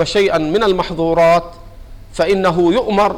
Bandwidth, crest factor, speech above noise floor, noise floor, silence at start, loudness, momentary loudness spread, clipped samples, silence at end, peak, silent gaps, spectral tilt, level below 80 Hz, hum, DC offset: 16 kHz; 8 dB; 21 dB; -34 dBFS; 0 s; -14 LUFS; 6 LU; under 0.1%; 0 s; -6 dBFS; none; -5.5 dB/octave; -36 dBFS; none; under 0.1%